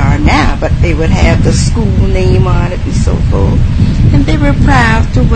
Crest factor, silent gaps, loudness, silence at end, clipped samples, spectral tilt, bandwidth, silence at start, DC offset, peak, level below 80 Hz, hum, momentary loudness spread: 8 dB; none; -10 LUFS; 0 s; 0.4%; -6.5 dB/octave; 9.2 kHz; 0 s; 4%; 0 dBFS; -12 dBFS; none; 4 LU